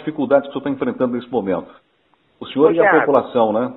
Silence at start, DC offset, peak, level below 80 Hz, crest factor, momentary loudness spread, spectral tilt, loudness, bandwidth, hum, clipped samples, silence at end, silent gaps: 0 s; under 0.1%; 0 dBFS; -60 dBFS; 18 dB; 12 LU; -9.5 dB/octave; -17 LUFS; 4.1 kHz; none; under 0.1%; 0 s; none